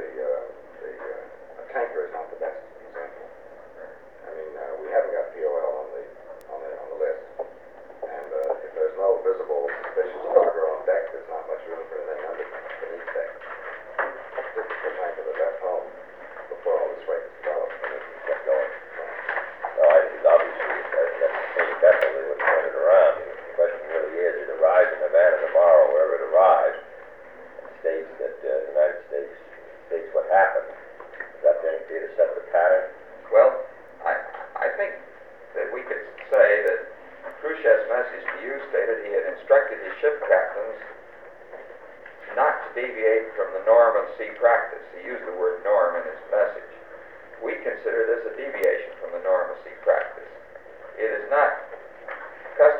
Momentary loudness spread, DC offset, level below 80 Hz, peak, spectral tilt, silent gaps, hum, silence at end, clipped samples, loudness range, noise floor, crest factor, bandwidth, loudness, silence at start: 22 LU; 0.2%; -68 dBFS; -4 dBFS; -5 dB/octave; none; none; 0 s; under 0.1%; 11 LU; -45 dBFS; 20 dB; 4.1 kHz; -23 LUFS; 0 s